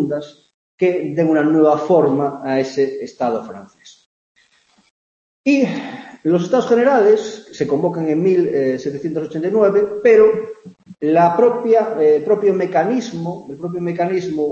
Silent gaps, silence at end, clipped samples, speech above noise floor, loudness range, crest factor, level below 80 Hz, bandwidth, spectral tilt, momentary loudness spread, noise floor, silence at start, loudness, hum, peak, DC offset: 0.54-0.78 s, 4.06-4.35 s, 4.91-5.44 s; 0 s; under 0.1%; 41 dB; 8 LU; 16 dB; -64 dBFS; 7.4 kHz; -7 dB/octave; 13 LU; -57 dBFS; 0 s; -17 LUFS; none; -2 dBFS; under 0.1%